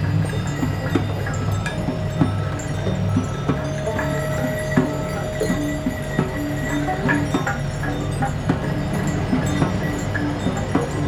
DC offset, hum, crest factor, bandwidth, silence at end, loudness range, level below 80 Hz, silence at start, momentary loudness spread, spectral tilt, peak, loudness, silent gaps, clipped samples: under 0.1%; none; 18 dB; 15.5 kHz; 0 s; 1 LU; -36 dBFS; 0 s; 4 LU; -6.5 dB/octave; -4 dBFS; -23 LUFS; none; under 0.1%